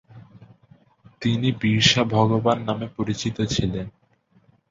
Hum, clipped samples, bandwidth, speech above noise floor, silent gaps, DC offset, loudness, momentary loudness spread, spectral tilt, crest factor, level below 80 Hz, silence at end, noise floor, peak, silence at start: none; under 0.1%; 7.8 kHz; 38 dB; none; under 0.1%; -22 LUFS; 11 LU; -5 dB/octave; 22 dB; -48 dBFS; 0.8 s; -60 dBFS; -2 dBFS; 0.15 s